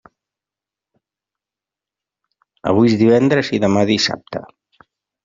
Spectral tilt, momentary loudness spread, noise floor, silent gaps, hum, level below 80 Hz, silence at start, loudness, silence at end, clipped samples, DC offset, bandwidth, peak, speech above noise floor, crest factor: -5.5 dB/octave; 15 LU; -88 dBFS; none; none; -56 dBFS; 2.65 s; -15 LUFS; 0.85 s; under 0.1%; under 0.1%; 7.6 kHz; -2 dBFS; 73 dB; 18 dB